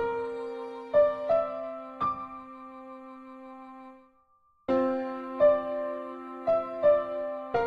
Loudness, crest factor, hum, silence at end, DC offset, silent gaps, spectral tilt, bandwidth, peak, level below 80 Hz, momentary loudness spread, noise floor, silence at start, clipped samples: -29 LUFS; 16 dB; none; 0 s; under 0.1%; none; -7.5 dB/octave; 5.2 kHz; -12 dBFS; -64 dBFS; 21 LU; -66 dBFS; 0 s; under 0.1%